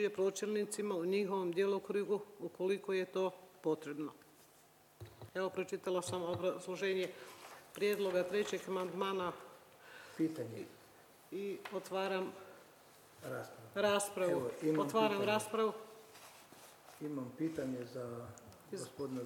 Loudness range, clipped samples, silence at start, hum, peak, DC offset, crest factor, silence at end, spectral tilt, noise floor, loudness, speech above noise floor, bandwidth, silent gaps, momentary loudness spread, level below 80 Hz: 7 LU; under 0.1%; 0 s; none; -20 dBFS; under 0.1%; 20 dB; 0 s; -4.5 dB/octave; -66 dBFS; -39 LUFS; 28 dB; 19 kHz; none; 20 LU; -82 dBFS